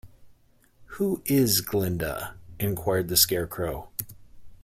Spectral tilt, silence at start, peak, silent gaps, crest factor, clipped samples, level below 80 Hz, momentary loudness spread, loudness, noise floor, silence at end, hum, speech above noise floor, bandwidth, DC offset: -4 dB/octave; 0.05 s; -6 dBFS; none; 22 dB; under 0.1%; -50 dBFS; 15 LU; -25 LUFS; -59 dBFS; 0.1 s; none; 33 dB; 16.5 kHz; under 0.1%